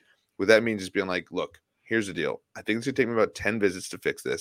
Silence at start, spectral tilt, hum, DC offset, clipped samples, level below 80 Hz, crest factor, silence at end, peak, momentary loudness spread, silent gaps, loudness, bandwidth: 0.4 s; -4.5 dB/octave; none; under 0.1%; under 0.1%; -62 dBFS; 22 dB; 0 s; -4 dBFS; 11 LU; none; -27 LUFS; 16.5 kHz